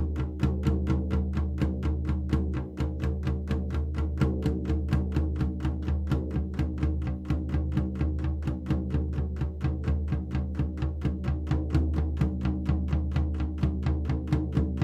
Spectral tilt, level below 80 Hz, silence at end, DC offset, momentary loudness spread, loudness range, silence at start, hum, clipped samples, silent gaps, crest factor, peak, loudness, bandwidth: -9 dB/octave; -32 dBFS; 0 s; under 0.1%; 4 LU; 1 LU; 0 s; none; under 0.1%; none; 16 dB; -12 dBFS; -30 LUFS; 6 kHz